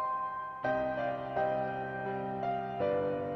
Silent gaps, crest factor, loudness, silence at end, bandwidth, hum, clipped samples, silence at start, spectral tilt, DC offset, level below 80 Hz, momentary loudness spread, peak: none; 14 dB; -34 LUFS; 0 s; 6.2 kHz; none; under 0.1%; 0 s; -8 dB/octave; under 0.1%; -64 dBFS; 4 LU; -20 dBFS